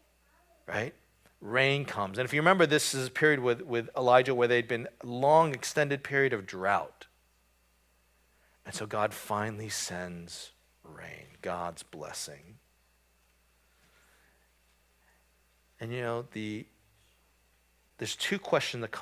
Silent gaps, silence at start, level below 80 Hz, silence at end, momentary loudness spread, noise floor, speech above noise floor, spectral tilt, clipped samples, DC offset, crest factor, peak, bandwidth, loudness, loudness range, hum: none; 0.7 s; -68 dBFS; 0 s; 19 LU; -69 dBFS; 39 dB; -4 dB/octave; under 0.1%; under 0.1%; 24 dB; -8 dBFS; 16 kHz; -29 LUFS; 16 LU; none